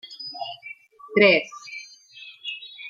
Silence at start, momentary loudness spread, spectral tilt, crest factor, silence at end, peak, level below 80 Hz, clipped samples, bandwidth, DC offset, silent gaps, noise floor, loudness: 0.05 s; 26 LU; -4.5 dB/octave; 22 dB; 0 s; -4 dBFS; -70 dBFS; under 0.1%; 7.4 kHz; under 0.1%; none; -46 dBFS; -21 LUFS